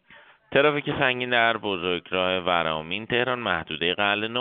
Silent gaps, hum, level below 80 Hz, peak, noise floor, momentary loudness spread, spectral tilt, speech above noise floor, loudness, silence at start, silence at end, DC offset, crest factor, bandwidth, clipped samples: none; none; -58 dBFS; -6 dBFS; -53 dBFS; 6 LU; -1.5 dB/octave; 29 dB; -24 LUFS; 0.1 s; 0 s; under 0.1%; 20 dB; 4.7 kHz; under 0.1%